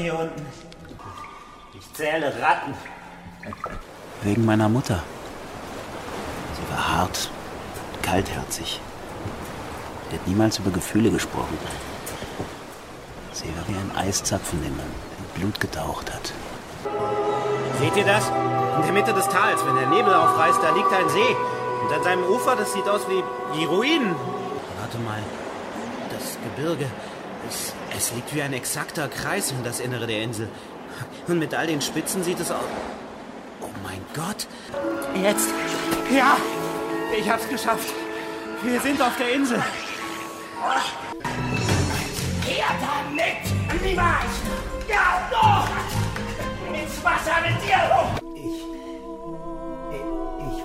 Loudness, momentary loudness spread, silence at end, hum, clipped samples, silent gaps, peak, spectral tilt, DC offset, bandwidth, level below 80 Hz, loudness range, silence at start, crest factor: -24 LUFS; 16 LU; 0 s; none; under 0.1%; none; -4 dBFS; -4.5 dB/octave; under 0.1%; 16 kHz; -42 dBFS; 9 LU; 0 s; 20 dB